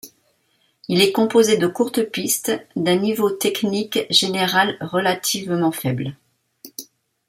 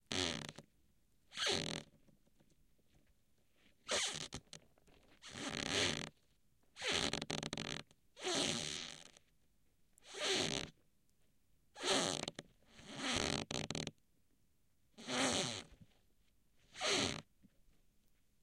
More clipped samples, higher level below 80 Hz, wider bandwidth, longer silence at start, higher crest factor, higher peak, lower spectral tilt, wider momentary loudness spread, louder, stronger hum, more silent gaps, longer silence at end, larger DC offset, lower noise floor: neither; about the same, -64 dBFS vs -68 dBFS; about the same, 16.5 kHz vs 16.5 kHz; about the same, 0.05 s vs 0.1 s; about the same, 20 dB vs 24 dB; first, 0 dBFS vs -20 dBFS; first, -3.5 dB/octave vs -2 dB/octave; second, 12 LU vs 17 LU; first, -19 LUFS vs -39 LUFS; neither; neither; second, 0.45 s vs 0.7 s; neither; second, -64 dBFS vs -79 dBFS